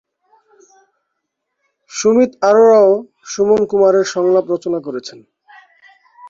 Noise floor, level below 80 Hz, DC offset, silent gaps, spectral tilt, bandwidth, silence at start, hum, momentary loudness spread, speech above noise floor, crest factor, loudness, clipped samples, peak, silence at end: -74 dBFS; -60 dBFS; under 0.1%; none; -4.5 dB/octave; 7.6 kHz; 1.95 s; none; 18 LU; 62 dB; 14 dB; -13 LUFS; under 0.1%; -2 dBFS; 0 s